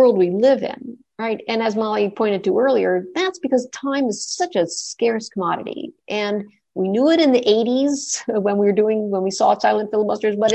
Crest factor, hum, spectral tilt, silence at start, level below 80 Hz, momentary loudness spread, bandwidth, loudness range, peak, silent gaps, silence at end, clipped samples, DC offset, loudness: 14 dB; none; -4.5 dB/octave; 0 s; -66 dBFS; 10 LU; 9 kHz; 5 LU; -4 dBFS; none; 0 s; under 0.1%; under 0.1%; -19 LUFS